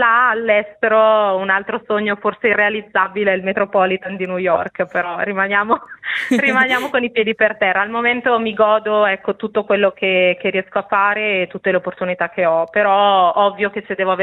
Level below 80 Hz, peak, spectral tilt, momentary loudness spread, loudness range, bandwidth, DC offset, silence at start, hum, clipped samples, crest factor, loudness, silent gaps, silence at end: -60 dBFS; -2 dBFS; -5.5 dB/octave; 7 LU; 2 LU; 13.5 kHz; under 0.1%; 0 s; none; under 0.1%; 16 dB; -16 LUFS; none; 0 s